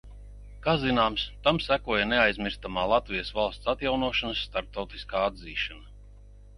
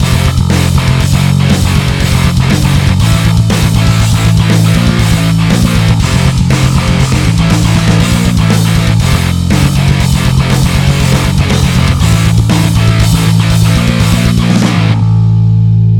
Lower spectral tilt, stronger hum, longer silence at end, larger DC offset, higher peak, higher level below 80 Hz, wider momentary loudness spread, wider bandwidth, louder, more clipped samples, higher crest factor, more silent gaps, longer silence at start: about the same, -6 dB/octave vs -5.5 dB/octave; first, 50 Hz at -45 dBFS vs none; about the same, 0 s vs 0 s; neither; second, -6 dBFS vs 0 dBFS; second, -44 dBFS vs -18 dBFS; first, 9 LU vs 1 LU; second, 11 kHz vs 18 kHz; second, -27 LUFS vs -9 LUFS; neither; first, 22 dB vs 8 dB; neither; about the same, 0.05 s vs 0 s